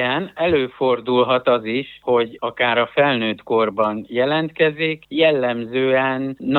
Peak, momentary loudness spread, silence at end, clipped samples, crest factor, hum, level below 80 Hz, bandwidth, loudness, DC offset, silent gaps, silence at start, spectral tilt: -4 dBFS; 5 LU; 0 s; under 0.1%; 16 dB; none; -60 dBFS; 4.5 kHz; -19 LUFS; under 0.1%; none; 0 s; -8 dB/octave